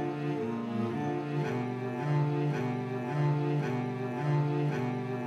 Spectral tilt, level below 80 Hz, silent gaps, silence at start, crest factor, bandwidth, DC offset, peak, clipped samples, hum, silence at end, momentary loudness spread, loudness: -8.5 dB/octave; -78 dBFS; none; 0 s; 12 dB; 7.2 kHz; under 0.1%; -18 dBFS; under 0.1%; none; 0 s; 5 LU; -32 LUFS